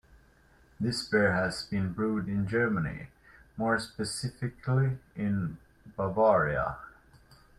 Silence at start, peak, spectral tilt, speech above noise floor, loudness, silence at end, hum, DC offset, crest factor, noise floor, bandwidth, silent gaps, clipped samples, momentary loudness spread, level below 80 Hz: 0.8 s; -12 dBFS; -6 dB/octave; 32 dB; -30 LUFS; 0.7 s; none; under 0.1%; 18 dB; -61 dBFS; 13.5 kHz; none; under 0.1%; 13 LU; -54 dBFS